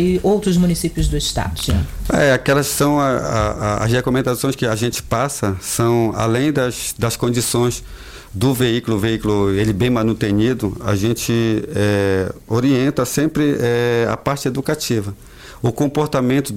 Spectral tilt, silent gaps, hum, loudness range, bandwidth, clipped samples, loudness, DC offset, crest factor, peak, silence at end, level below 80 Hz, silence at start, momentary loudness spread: -5.5 dB/octave; none; none; 2 LU; 16.5 kHz; under 0.1%; -18 LUFS; under 0.1%; 12 dB; -6 dBFS; 0 s; -34 dBFS; 0 s; 5 LU